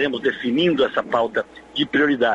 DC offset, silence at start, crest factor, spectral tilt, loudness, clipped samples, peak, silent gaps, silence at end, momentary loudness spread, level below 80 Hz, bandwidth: under 0.1%; 0 s; 16 dB; -6 dB/octave; -21 LUFS; under 0.1%; -4 dBFS; none; 0 s; 7 LU; -56 dBFS; 8 kHz